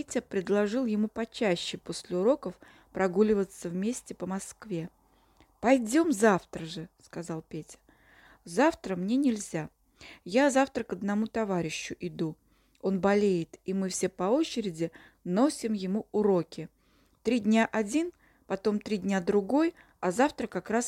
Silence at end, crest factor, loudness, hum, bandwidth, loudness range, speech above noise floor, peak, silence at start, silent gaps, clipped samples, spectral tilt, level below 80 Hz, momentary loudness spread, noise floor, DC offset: 0 s; 20 dB; -29 LUFS; none; 15 kHz; 2 LU; 37 dB; -10 dBFS; 0 s; none; under 0.1%; -5.5 dB/octave; -64 dBFS; 13 LU; -66 dBFS; under 0.1%